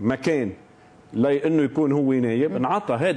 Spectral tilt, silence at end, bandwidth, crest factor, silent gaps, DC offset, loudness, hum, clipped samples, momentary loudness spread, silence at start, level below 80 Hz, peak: -7.5 dB/octave; 0 s; 11 kHz; 12 dB; none; under 0.1%; -22 LUFS; none; under 0.1%; 5 LU; 0 s; -62 dBFS; -10 dBFS